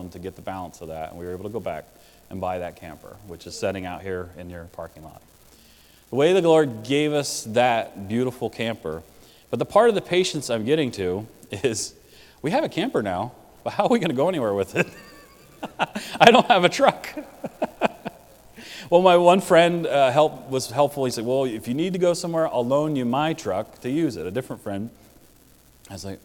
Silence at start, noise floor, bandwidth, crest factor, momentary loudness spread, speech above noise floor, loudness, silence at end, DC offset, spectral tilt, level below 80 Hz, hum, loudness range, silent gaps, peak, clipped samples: 0 s; -54 dBFS; 18 kHz; 24 dB; 21 LU; 31 dB; -22 LUFS; 0.1 s; under 0.1%; -5 dB/octave; -58 dBFS; none; 13 LU; none; 0 dBFS; under 0.1%